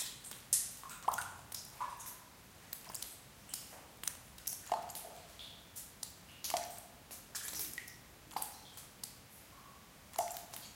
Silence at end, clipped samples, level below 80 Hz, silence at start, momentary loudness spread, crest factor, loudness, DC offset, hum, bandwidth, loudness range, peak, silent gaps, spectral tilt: 0 s; under 0.1%; -70 dBFS; 0 s; 15 LU; 34 dB; -43 LUFS; under 0.1%; none; 17 kHz; 5 LU; -12 dBFS; none; -0.5 dB/octave